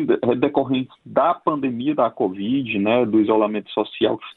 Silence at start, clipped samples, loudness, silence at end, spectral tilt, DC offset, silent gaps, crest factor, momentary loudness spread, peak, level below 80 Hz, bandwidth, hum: 0 s; under 0.1%; -20 LUFS; 0.05 s; -9.5 dB/octave; under 0.1%; none; 16 dB; 6 LU; -4 dBFS; -62 dBFS; 4.2 kHz; none